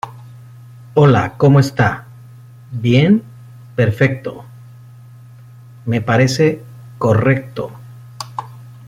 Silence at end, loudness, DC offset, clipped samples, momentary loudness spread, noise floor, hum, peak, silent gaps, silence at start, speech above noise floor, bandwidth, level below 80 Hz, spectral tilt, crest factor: 0.15 s; -15 LUFS; under 0.1%; under 0.1%; 18 LU; -39 dBFS; none; -2 dBFS; none; 0.05 s; 26 dB; 13.5 kHz; -50 dBFS; -7 dB/octave; 16 dB